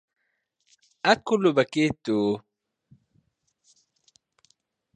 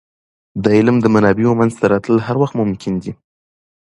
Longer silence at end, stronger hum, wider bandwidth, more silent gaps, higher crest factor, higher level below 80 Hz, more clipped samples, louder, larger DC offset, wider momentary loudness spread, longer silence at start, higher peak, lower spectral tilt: first, 2.55 s vs 0.85 s; neither; second, 9.8 kHz vs 11 kHz; neither; first, 24 dB vs 16 dB; second, -64 dBFS vs -48 dBFS; neither; second, -24 LUFS vs -15 LUFS; neither; second, 6 LU vs 11 LU; first, 1.05 s vs 0.55 s; second, -4 dBFS vs 0 dBFS; second, -5.5 dB/octave vs -8 dB/octave